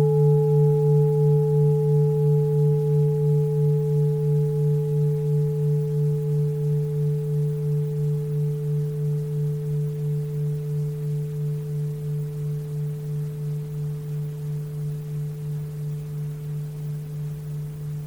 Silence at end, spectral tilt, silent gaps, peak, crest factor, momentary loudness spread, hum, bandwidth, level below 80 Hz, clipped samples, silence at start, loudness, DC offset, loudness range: 0 s; -10.5 dB/octave; none; -10 dBFS; 12 dB; 11 LU; none; 2.5 kHz; -52 dBFS; under 0.1%; 0 s; -24 LUFS; under 0.1%; 10 LU